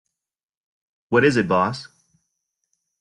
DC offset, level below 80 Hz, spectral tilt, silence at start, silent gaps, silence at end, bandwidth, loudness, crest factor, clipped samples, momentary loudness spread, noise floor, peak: under 0.1%; -60 dBFS; -6 dB/octave; 1.1 s; none; 1.15 s; 11 kHz; -19 LUFS; 20 dB; under 0.1%; 9 LU; -86 dBFS; -6 dBFS